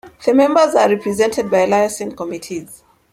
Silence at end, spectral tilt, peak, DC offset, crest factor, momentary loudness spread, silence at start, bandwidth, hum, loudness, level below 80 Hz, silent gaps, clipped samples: 0.4 s; -4.5 dB/octave; -2 dBFS; under 0.1%; 14 dB; 14 LU; 0.05 s; 16 kHz; none; -15 LUFS; -56 dBFS; none; under 0.1%